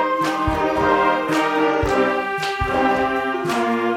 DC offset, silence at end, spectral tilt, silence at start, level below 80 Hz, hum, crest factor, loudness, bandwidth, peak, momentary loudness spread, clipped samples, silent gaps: under 0.1%; 0 s; -5 dB/octave; 0 s; -38 dBFS; none; 16 dB; -19 LUFS; 16.5 kHz; -4 dBFS; 4 LU; under 0.1%; none